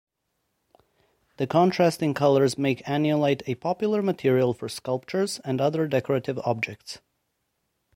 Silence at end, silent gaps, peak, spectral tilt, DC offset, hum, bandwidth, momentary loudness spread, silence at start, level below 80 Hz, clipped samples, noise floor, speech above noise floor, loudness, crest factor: 1 s; none; -8 dBFS; -6 dB/octave; under 0.1%; none; 16.5 kHz; 9 LU; 1.4 s; -66 dBFS; under 0.1%; -77 dBFS; 53 dB; -25 LUFS; 18 dB